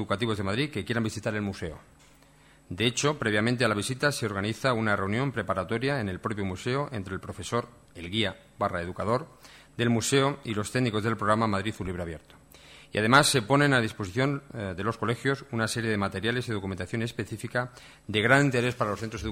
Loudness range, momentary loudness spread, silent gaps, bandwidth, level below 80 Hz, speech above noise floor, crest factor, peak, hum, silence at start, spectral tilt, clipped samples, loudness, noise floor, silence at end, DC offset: 6 LU; 12 LU; none; 16 kHz; -56 dBFS; 29 dB; 24 dB; -6 dBFS; none; 0 s; -4.5 dB/octave; under 0.1%; -28 LUFS; -57 dBFS; 0 s; under 0.1%